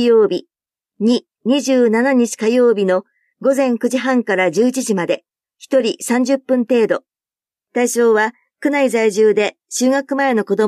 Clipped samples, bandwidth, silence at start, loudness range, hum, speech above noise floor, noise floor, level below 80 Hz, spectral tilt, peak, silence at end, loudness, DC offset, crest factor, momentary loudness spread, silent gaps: under 0.1%; 14.5 kHz; 0 s; 2 LU; none; over 75 dB; under -90 dBFS; -72 dBFS; -4.5 dB/octave; -2 dBFS; 0 s; -16 LUFS; under 0.1%; 14 dB; 7 LU; none